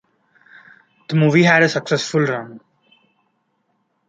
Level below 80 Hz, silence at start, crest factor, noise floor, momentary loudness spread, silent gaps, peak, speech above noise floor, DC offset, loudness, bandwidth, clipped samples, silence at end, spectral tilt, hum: -64 dBFS; 1.1 s; 18 dB; -68 dBFS; 12 LU; none; -2 dBFS; 52 dB; under 0.1%; -16 LUFS; 8.8 kHz; under 0.1%; 1.5 s; -5.5 dB/octave; none